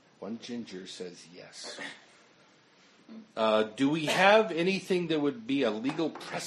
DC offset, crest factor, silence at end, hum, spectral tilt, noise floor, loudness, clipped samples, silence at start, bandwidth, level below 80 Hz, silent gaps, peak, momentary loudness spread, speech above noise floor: under 0.1%; 24 dB; 0 s; none; -4.5 dB/octave; -61 dBFS; -28 LUFS; under 0.1%; 0.2 s; 12.5 kHz; -80 dBFS; none; -6 dBFS; 20 LU; 32 dB